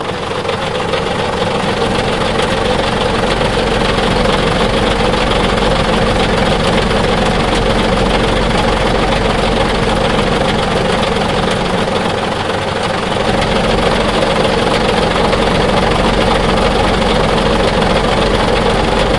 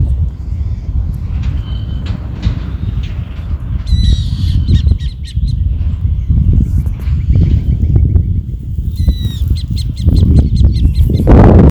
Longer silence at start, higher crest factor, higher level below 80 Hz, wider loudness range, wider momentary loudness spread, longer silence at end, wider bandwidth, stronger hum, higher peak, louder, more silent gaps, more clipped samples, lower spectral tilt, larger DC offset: about the same, 0 s vs 0 s; about the same, 12 dB vs 10 dB; second, -22 dBFS vs -14 dBFS; second, 2 LU vs 6 LU; second, 3 LU vs 10 LU; about the same, 0 s vs 0 s; first, 11.5 kHz vs 8.8 kHz; neither; about the same, 0 dBFS vs 0 dBFS; about the same, -13 LUFS vs -14 LUFS; neither; second, under 0.1% vs 0.9%; second, -5 dB/octave vs -8.5 dB/octave; first, 0.9% vs under 0.1%